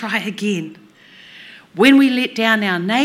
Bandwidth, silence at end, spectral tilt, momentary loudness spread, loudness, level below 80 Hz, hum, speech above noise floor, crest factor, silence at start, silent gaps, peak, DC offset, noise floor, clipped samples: 14.5 kHz; 0 s; -5 dB/octave; 15 LU; -15 LUFS; -66 dBFS; none; 29 dB; 18 dB; 0 s; none; 0 dBFS; under 0.1%; -44 dBFS; under 0.1%